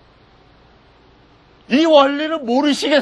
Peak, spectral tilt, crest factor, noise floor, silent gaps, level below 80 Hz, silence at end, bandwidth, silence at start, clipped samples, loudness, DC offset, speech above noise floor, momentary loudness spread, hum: 0 dBFS; -3.5 dB/octave; 18 dB; -50 dBFS; none; -58 dBFS; 0 s; 12.5 kHz; 1.7 s; under 0.1%; -15 LUFS; under 0.1%; 35 dB; 8 LU; none